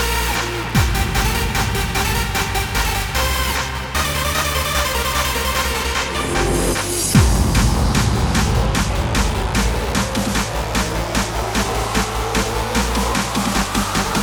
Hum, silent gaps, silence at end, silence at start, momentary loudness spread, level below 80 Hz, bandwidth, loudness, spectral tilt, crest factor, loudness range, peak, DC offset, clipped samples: none; none; 0 s; 0 s; 3 LU; -24 dBFS; over 20 kHz; -18 LUFS; -4 dB/octave; 18 dB; 3 LU; 0 dBFS; under 0.1%; under 0.1%